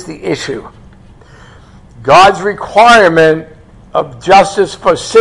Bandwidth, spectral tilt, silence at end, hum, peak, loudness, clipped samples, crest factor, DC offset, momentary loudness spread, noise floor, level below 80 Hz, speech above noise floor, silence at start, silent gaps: 12 kHz; -4 dB/octave; 0 s; none; 0 dBFS; -9 LUFS; 1%; 10 dB; under 0.1%; 13 LU; -38 dBFS; -40 dBFS; 29 dB; 0 s; none